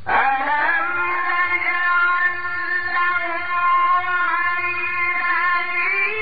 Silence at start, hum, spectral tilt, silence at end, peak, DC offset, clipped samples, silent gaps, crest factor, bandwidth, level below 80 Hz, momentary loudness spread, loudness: 0 s; none; 0.5 dB/octave; 0 s; -4 dBFS; 3%; under 0.1%; none; 14 dB; 5 kHz; -58 dBFS; 4 LU; -19 LUFS